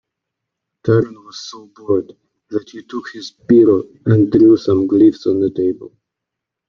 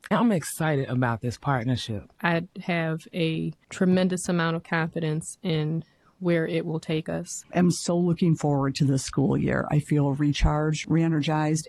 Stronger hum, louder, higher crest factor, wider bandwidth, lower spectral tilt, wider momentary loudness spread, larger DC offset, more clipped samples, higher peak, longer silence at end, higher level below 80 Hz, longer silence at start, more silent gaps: neither; first, -15 LUFS vs -26 LUFS; second, 14 dB vs 20 dB; second, 7 kHz vs 13 kHz; first, -8.5 dB/octave vs -6 dB/octave; first, 20 LU vs 7 LU; neither; neither; first, -2 dBFS vs -6 dBFS; first, 0.8 s vs 0 s; second, -54 dBFS vs -42 dBFS; first, 0.85 s vs 0.05 s; neither